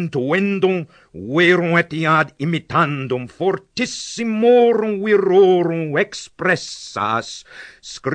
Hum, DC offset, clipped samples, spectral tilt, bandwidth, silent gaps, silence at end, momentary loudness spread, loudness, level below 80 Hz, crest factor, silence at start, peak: none; under 0.1%; under 0.1%; -5.5 dB/octave; 9.6 kHz; none; 0 s; 15 LU; -18 LUFS; -58 dBFS; 16 dB; 0 s; -2 dBFS